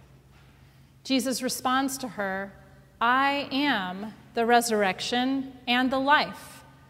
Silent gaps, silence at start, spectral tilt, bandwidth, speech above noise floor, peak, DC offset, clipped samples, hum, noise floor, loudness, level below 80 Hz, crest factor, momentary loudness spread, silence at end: none; 1.05 s; -3 dB/octave; 16 kHz; 29 dB; -6 dBFS; under 0.1%; under 0.1%; none; -55 dBFS; -26 LUFS; -62 dBFS; 20 dB; 13 LU; 0.3 s